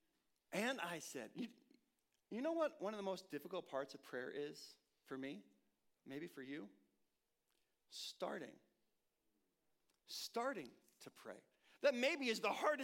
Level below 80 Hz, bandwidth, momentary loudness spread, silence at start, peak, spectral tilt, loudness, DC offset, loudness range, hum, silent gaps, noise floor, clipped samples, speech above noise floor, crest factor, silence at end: under -90 dBFS; 16.5 kHz; 19 LU; 0.5 s; -24 dBFS; -3.5 dB/octave; -45 LUFS; under 0.1%; 10 LU; none; none; -87 dBFS; under 0.1%; 42 dB; 24 dB; 0 s